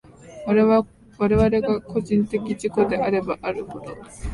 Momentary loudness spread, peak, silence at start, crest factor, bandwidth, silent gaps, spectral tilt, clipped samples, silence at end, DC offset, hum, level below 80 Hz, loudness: 17 LU; -6 dBFS; 0.25 s; 16 dB; 11.5 kHz; none; -7.5 dB/octave; under 0.1%; 0 s; under 0.1%; none; -40 dBFS; -22 LUFS